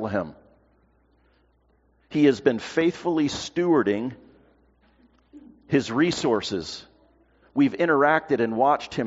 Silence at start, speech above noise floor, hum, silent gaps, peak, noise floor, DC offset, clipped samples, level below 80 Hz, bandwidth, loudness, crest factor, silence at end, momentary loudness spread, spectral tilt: 0 s; 41 dB; none; none; -6 dBFS; -63 dBFS; under 0.1%; under 0.1%; -60 dBFS; 8 kHz; -23 LUFS; 20 dB; 0 s; 11 LU; -4.5 dB/octave